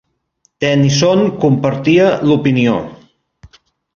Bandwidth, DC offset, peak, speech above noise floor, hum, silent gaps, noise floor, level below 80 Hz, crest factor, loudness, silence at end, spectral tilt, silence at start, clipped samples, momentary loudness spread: 7.2 kHz; under 0.1%; 0 dBFS; 49 dB; none; none; -61 dBFS; -48 dBFS; 14 dB; -13 LUFS; 1 s; -6 dB/octave; 0.6 s; under 0.1%; 7 LU